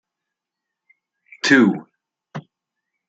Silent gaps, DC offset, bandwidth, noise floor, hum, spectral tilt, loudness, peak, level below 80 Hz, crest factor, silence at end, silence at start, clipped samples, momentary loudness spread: none; under 0.1%; 9.2 kHz; -83 dBFS; none; -4.5 dB/octave; -16 LUFS; -2 dBFS; -72 dBFS; 22 dB; 0.7 s; 1.45 s; under 0.1%; 23 LU